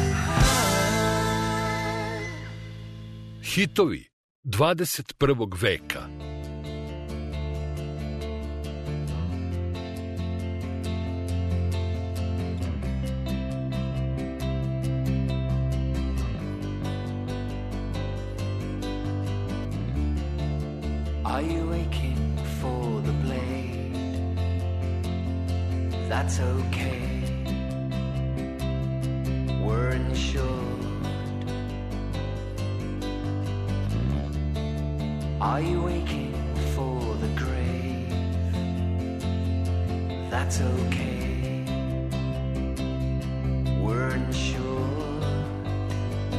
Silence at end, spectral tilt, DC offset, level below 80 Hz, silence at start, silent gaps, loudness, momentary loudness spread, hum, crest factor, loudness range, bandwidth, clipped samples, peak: 0 s; -6 dB/octave; under 0.1%; -34 dBFS; 0 s; 4.13-4.43 s; -28 LUFS; 8 LU; none; 18 dB; 4 LU; 13.5 kHz; under 0.1%; -10 dBFS